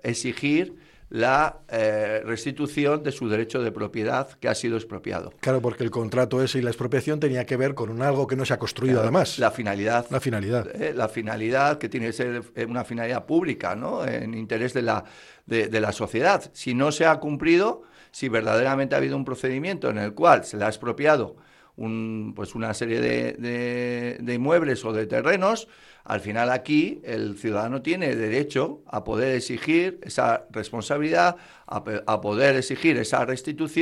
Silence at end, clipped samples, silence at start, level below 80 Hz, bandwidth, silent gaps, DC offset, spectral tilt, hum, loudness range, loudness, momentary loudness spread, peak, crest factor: 0 s; under 0.1%; 0.05 s; -58 dBFS; 13 kHz; none; under 0.1%; -5.5 dB/octave; none; 3 LU; -25 LUFS; 9 LU; -2 dBFS; 22 dB